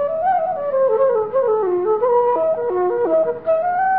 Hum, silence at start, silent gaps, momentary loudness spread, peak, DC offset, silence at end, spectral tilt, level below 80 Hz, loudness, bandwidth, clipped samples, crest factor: none; 0 s; none; 3 LU; -6 dBFS; 0.3%; 0 s; -10.5 dB/octave; -60 dBFS; -18 LUFS; 4 kHz; under 0.1%; 12 dB